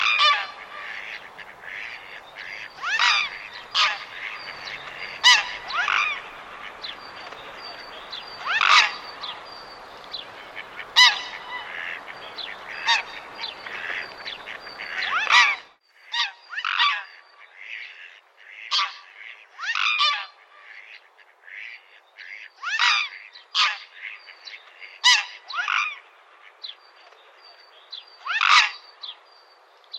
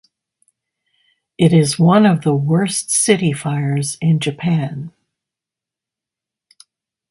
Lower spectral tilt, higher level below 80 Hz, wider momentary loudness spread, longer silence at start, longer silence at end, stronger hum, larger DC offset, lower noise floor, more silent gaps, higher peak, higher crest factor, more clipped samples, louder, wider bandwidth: second, 2.5 dB/octave vs -5.5 dB/octave; second, -68 dBFS vs -58 dBFS; first, 24 LU vs 8 LU; second, 0 s vs 1.4 s; second, 0 s vs 2.2 s; neither; neither; second, -54 dBFS vs -87 dBFS; neither; about the same, -2 dBFS vs 0 dBFS; first, 24 dB vs 18 dB; neither; second, -21 LUFS vs -15 LUFS; first, 16 kHz vs 11.5 kHz